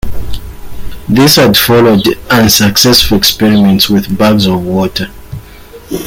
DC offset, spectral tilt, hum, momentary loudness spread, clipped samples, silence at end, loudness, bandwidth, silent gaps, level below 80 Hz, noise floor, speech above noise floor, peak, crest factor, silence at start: under 0.1%; -4 dB/octave; none; 19 LU; 0.3%; 0 s; -7 LUFS; over 20 kHz; none; -26 dBFS; -32 dBFS; 24 dB; 0 dBFS; 8 dB; 0.05 s